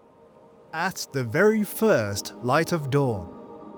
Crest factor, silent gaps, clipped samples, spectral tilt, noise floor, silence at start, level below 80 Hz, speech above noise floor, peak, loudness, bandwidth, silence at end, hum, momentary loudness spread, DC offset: 18 dB; none; under 0.1%; -5.5 dB/octave; -53 dBFS; 0.75 s; -60 dBFS; 29 dB; -8 dBFS; -24 LUFS; over 20 kHz; 0 s; none; 13 LU; under 0.1%